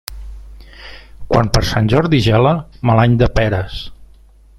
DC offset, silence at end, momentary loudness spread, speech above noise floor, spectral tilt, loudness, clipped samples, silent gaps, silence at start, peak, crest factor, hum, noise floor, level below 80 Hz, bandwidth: under 0.1%; 0.55 s; 23 LU; 30 dB; -6.5 dB/octave; -14 LUFS; under 0.1%; none; 0.1 s; 0 dBFS; 16 dB; none; -44 dBFS; -28 dBFS; 16.5 kHz